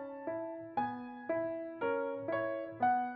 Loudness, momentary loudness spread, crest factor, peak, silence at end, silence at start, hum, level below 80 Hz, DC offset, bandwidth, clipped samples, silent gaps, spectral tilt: -37 LUFS; 8 LU; 16 dB; -20 dBFS; 0 s; 0 s; none; -76 dBFS; under 0.1%; 4.9 kHz; under 0.1%; none; -4.5 dB/octave